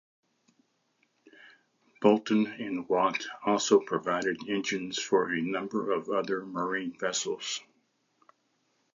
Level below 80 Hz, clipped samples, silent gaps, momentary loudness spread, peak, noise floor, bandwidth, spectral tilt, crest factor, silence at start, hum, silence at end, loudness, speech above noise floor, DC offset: -76 dBFS; under 0.1%; none; 8 LU; -8 dBFS; -74 dBFS; 7.6 kHz; -4 dB/octave; 22 dB; 1.45 s; none; 1.35 s; -29 LUFS; 45 dB; under 0.1%